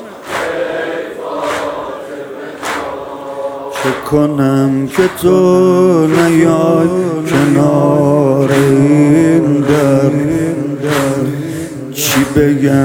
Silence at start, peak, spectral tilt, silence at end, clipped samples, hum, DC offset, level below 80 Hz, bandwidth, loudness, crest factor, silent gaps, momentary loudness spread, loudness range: 0 s; 0 dBFS; -6.5 dB/octave; 0 s; under 0.1%; none; under 0.1%; -44 dBFS; 18 kHz; -12 LUFS; 12 dB; none; 13 LU; 10 LU